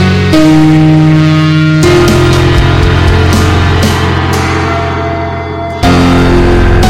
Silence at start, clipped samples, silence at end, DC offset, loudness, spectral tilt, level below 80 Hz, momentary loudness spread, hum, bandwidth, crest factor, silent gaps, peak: 0 s; 0.4%; 0 s; under 0.1%; -7 LUFS; -6.5 dB/octave; -18 dBFS; 7 LU; none; 16 kHz; 6 dB; none; 0 dBFS